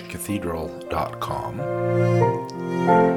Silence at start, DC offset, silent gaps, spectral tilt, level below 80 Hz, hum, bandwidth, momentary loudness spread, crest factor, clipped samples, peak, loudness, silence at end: 0 s; under 0.1%; none; -7 dB/octave; -50 dBFS; none; 17.5 kHz; 9 LU; 18 dB; under 0.1%; -4 dBFS; -24 LUFS; 0 s